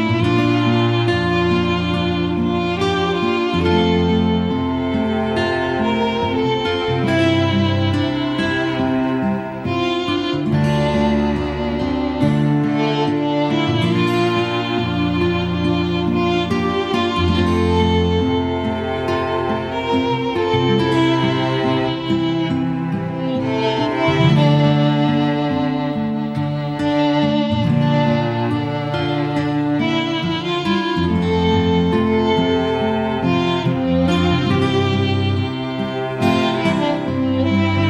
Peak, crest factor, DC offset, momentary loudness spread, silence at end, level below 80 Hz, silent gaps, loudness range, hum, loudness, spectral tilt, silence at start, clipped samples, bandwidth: -2 dBFS; 14 dB; under 0.1%; 5 LU; 0 s; -42 dBFS; none; 2 LU; none; -18 LUFS; -7 dB/octave; 0 s; under 0.1%; 11 kHz